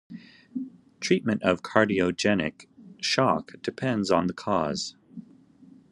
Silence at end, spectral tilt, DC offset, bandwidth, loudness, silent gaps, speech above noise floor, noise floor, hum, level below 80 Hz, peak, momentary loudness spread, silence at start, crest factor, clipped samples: 0.7 s; -5 dB/octave; under 0.1%; 11.5 kHz; -26 LUFS; none; 28 dB; -54 dBFS; none; -64 dBFS; -2 dBFS; 19 LU; 0.1 s; 24 dB; under 0.1%